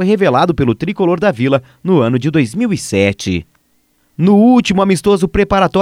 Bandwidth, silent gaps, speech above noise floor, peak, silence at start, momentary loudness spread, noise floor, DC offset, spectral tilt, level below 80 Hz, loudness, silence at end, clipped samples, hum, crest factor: 14 kHz; none; 46 dB; 0 dBFS; 0 s; 7 LU; -58 dBFS; under 0.1%; -6.5 dB/octave; -36 dBFS; -13 LUFS; 0 s; under 0.1%; none; 12 dB